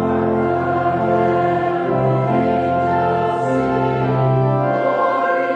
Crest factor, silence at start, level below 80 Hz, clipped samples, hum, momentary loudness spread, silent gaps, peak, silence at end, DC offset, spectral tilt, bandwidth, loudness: 12 dB; 0 s; -46 dBFS; under 0.1%; none; 2 LU; none; -4 dBFS; 0 s; under 0.1%; -9 dB/octave; 8.2 kHz; -17 LUFS